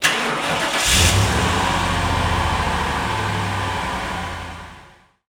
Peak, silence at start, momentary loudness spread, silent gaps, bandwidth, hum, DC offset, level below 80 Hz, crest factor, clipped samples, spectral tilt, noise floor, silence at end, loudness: 0 dBFS; 0 s; 13 LU; none; 20 kHz; none; under 0.1%; -30 dBFS; 20 dB; under 0.1%; -3 dB/octave; -48 dBFS; 0.4 s; -19 LUFS